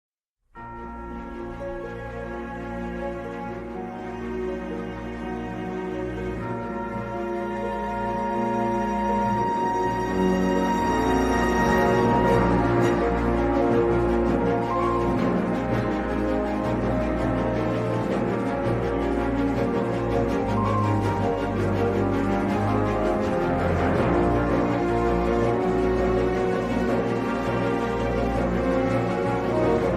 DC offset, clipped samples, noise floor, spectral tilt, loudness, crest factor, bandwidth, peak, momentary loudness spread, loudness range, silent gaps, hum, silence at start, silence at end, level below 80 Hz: under 0.1%; under 0.1%; -52 dBFS; -7.5 dB/octave; -24 LUFS; 16 dB; 15 kHz; -8 dBFS; 12 LU; 10 LU; none; none; 0.55 s; 0 s; -36 dBFS